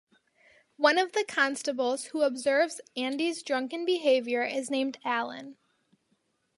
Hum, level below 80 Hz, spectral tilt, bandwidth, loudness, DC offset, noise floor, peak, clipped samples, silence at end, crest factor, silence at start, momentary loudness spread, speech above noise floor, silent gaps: none; -84 dBFS; -1.5 dB/octave; 11.5 kHz; -28 LUFS; under 0.1%; -74 dBFS; -8 dBFS; under 0.1%; 1.05 s; 22 dB; 0.8 s; 7 LU; 46 dB; none